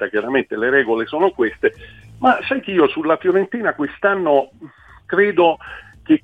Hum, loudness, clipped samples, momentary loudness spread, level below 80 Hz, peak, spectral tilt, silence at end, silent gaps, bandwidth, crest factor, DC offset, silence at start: none; -18 LUFS; under 0.1%; 6 LU; -52 dBFS; -2 dBFS; -7.5 dB/octave; 0.05 s; none; 4.8 kHz; 16 dB; under 0.1%; 0 s